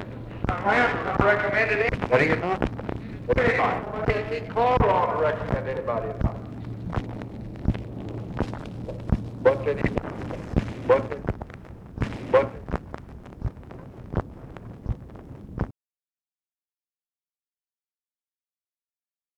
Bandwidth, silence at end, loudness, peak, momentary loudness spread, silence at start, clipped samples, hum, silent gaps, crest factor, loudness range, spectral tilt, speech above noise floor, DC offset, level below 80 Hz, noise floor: 10 kHz; 3.65 s; -26 LUFS; -4 dBFS; 16 LU; 0 s; under 0.1%; none; none; 24 dB; 14 LU; -7.5 dB/octave; over 67 dB; under 0.1%; -40 dBFS; under -90 dBFS